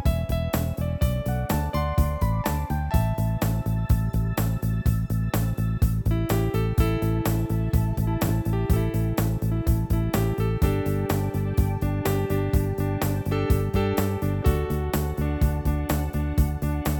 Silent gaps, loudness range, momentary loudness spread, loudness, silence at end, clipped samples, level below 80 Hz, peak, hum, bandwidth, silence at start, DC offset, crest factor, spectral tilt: none; 1 LU; 3 LU; -25 LUFS; 0 s; under 0.1%; -28 dBFS; -8 dBFS; none; over 20 kHz; 0 s; under 0.1%; 14 dB; -7 dB/octave